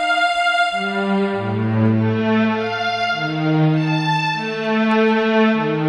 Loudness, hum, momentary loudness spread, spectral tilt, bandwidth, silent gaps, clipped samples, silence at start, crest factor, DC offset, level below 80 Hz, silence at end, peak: -18 LUFS; none; 5 LU; -6.5 dB/octave; 10.5 kHz; none; under 0.1%; 0 s; 14 dB; under 0.1%; -60 dBFS; 0 s; -4 dBFS